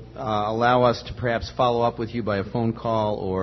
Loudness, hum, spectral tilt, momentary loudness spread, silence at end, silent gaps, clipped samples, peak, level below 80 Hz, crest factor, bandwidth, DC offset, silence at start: -23 LUFS; none; -7 dB/octave; 7 LU; 0 s; none; under 0.1%; -6 dBFS; -46 dBFS; 18 dB; 6.2 kHz; under 0.1%; 0 s